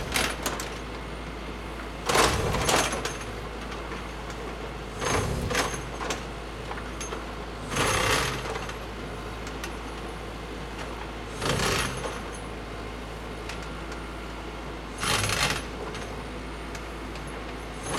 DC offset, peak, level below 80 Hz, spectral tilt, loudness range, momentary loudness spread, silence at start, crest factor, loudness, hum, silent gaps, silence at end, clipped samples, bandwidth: under 0.1%; -6 dBFS; -40 dBFS; -3 dB/octave; 4 LU; 13 LU; 0 s; 24 dB; -30 LUFS; none; none; 0 s; under 0.1%; 16.5 kHz